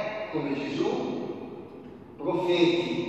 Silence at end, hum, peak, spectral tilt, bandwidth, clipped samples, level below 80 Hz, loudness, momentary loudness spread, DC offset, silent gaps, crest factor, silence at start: 0 s; none; -12 dBFS; -6 dB/octave; 8.2 kHz; under 0.1%; -66 dBFS; -28 LUFS; 20 LU; under 0.1%; none; 18 dB; 0 s